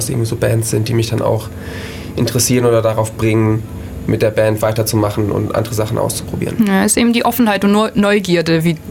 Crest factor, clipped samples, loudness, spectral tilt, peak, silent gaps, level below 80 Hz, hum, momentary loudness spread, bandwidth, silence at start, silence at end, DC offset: 12 dB; under 0.1%; -15 LUFS; -5 dB/octave; -2 dBFS; none; -38 dBFS; none; 9 LU; 17.5 kHz; 0 s; 0 s; under 0.1%